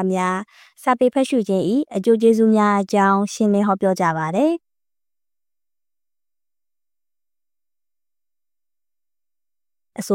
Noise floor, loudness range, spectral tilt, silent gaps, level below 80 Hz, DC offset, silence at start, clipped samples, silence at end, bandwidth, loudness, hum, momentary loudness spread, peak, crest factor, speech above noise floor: under -90 dBFS; 9 LU; -6.5 dB/octave; none; -70 dBFS; under 0.1%; 0 s; under 0.1%; 0 s; 16 kHz; -18 LUFS; none; 9 LU; -4 dBFS; 16 dB; over 72 dB